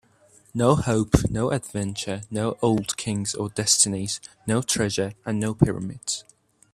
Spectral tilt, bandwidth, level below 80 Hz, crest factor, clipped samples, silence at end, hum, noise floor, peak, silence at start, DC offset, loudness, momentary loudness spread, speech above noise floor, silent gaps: -4.5 dB/octave; 14.5 kHz; -42 dBFS; 24 dB; under 0.1%; 0.5 s; none; -57 dBFS; 0 dBFS; 0.55 s; under 0.1%; -24 LUFS; 10 LU; 33 dB; none